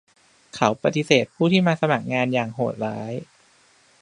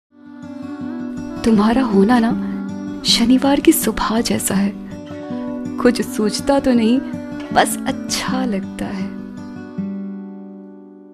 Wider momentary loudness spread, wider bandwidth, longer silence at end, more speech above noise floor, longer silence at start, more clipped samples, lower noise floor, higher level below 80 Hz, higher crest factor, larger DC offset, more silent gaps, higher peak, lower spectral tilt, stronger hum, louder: second, 13 LU vs 18 LU; second, 10.5 kHz vs 14.5 kHz; first, 0.8 s vs 0 s; first, 36 dB vs 23 dB; first, 0.55 s vs 0.25 s; neither; first, -57 dBFS vs -39 dBFS; second, -64 dBFS vs -44 dBFS; about the same, 22 dB vs 18 dB; neither; neither; about the same, -2 dBFS vs 0 dBFS; about the same, -5.5 dB/octave vs -4.5 dB/octave; neither; second, -22 LUFS vs -18 LUFS